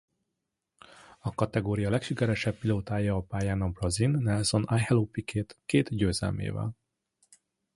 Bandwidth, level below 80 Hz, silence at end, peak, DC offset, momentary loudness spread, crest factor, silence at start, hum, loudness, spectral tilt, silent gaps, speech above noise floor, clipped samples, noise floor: 11.5 kHz; -48 dBFS; 1 s; -10 dBFS; under 0.1%; 8 LU; 20 dB; 1.25 s; none; -29 LUFS; -6 dB/octave; none; 56 dB; under 0.1%; -84 dBFS